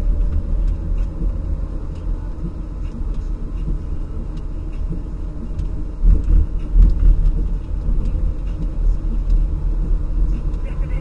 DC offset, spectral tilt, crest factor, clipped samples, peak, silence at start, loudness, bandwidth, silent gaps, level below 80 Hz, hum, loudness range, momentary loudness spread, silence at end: under 0.1%; -9.5 dB/octave; 16 dB; under 0.1%; -2 dBFS; 0 s; -24 LUFS; 2.9 kHz; none; -18 dBFS; none; 7 LU; 11 LU; 0 s